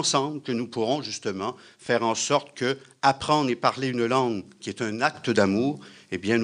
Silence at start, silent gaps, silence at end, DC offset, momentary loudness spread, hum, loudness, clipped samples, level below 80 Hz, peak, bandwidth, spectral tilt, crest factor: 0 s; none; 0 s; under 0.1%; 10 LU; none; -26 LUFS; under 0.1%; -66 dBFS; -6 dBFS; 10.5 kHz; -4 dB/octave; 20 dB